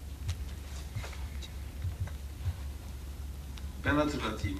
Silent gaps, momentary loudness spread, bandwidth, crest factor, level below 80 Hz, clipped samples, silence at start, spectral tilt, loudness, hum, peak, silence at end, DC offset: none; 13 LU; 14.5 kHz; 20 dB; -42 dBFS; under 0.1%; 0 s; -6 dB/octave; -37 LUFS; none; -16 dBFS; 0 s; under 0.1%